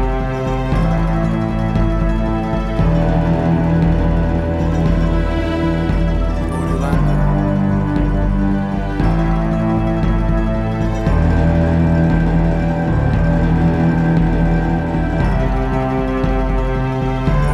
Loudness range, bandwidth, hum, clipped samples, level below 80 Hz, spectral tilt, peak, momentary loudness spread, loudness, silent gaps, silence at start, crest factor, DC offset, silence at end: 2 LU; 7.4 kHz; none; under 0.1%; -20 dBFS; -9 dB/octave; -2 dBFS; 4 LU; -17 LUFS; none; 0 s; 12 dB; under 0.1%; 0 s